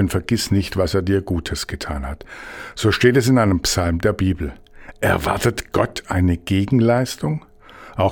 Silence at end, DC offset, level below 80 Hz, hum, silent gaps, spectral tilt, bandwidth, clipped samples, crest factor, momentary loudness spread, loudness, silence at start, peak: 0 s; under 0.1%; -38 dBFS; none; none; -5.5 dB/octave; 18 kHz; under 0.1%; 18 dB; 13 LU; -19 LUFS; 0 s; 0 dBFS